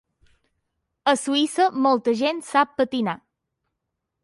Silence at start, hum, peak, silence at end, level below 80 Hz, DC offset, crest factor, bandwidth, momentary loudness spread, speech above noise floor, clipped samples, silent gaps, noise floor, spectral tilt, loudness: 1.05 s; none; -6 dBFS; 1.1 s; -68 dBFS; under 0.1%; 18 dB; 11.5 kHz; 6 LU; 59 dB; under 0.1%; none; -80 dBFS; -3.5 dB/octave; -22 LUFS